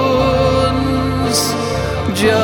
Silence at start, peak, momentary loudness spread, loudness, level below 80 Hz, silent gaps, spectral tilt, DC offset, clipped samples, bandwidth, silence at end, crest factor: 0 s; -2 dBFS; 5 LU; -15 LUFS; -28 dBFS; none; -5 dB/octave; under 0.1%; under 0.1%; 19 kHz; 0 s; 14 dB